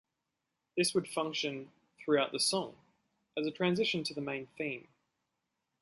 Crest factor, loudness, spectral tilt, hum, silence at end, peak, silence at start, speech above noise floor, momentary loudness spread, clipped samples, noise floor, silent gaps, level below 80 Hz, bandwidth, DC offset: 20 dB; -34 LUFS; -3.5 dB/octave; none; 1 s; -16 dBFS; 0.75 s; 52 dB; 13 LU; under 0.1%; -86 dBFS; none; -76 dBFS; 12 kHz; under 0.1%